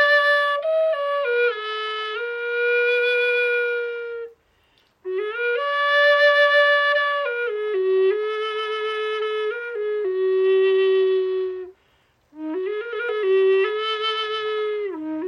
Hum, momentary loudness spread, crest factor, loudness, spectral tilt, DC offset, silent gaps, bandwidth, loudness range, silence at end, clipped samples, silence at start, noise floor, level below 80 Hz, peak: none; 12 LU; 14 dB; -21 LUFS; -2.5 dB/octave; under 0.1%; none; 9.8 kHz; 5 LU; 0 s; under 0.1%; 0 s; -62 dBFS; -72 dBFS; -8 dBFS